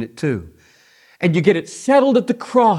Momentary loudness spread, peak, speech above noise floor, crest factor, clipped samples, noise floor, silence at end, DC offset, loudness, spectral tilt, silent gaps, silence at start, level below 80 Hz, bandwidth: 9 LU; 0 dBFS; 36 dB; 16 dB; under 0.1%; -52 dBFS; 0 s; under 0.1%; -17 LUFS; -6.5 dB/octave; none; 0 s; -58 dBFS; 12 kHz